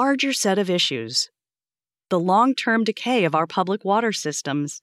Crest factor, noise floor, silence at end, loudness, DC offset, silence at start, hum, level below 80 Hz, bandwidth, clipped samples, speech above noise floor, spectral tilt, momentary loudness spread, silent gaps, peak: 16 dB; under -90 dBFS; 0.05 s; -21 LUFS; under 0.1%; 0 s; none; -84 dBFS; 14.5 kHz; under 0.1%; over 69 dB; -3.5 dB/octave; 7 LU; none; -6 dBFS